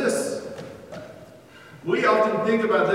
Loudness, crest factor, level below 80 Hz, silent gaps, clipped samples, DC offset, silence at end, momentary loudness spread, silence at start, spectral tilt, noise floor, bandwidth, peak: -22 LUFS; 16 dB; -66 dBFS; none; under 0.1%; under 0.1%; 0 s; 20 LU; 0 s; -4.5 dB/octave; -47 dBFS; 15.5 kHz; -8 dBFS